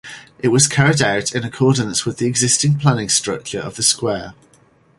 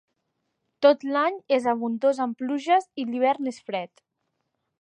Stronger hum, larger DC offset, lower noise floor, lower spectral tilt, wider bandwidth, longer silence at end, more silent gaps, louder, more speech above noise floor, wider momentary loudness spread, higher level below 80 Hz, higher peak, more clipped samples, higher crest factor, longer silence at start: neither; neither; second, -53 dBFS vs -78 dBFS; second, -3.5 dB/octave vs -5 dB/octave; first, 11.5 kHz vs 9.6 kHz; second, 0.65 s vs 0.95 s; neither; first, -16 LUFS vs -24 LUFS; second, 36 dB vs 54 dB; about the same, 11 LU vs 11 LU; first, -50 dBFS vs -80 dBFS; first, 0 dBFS vs -4 dBFS; neither; about the same, 18 dB vs 20 dB; second, 0.05 s vs 0.8 s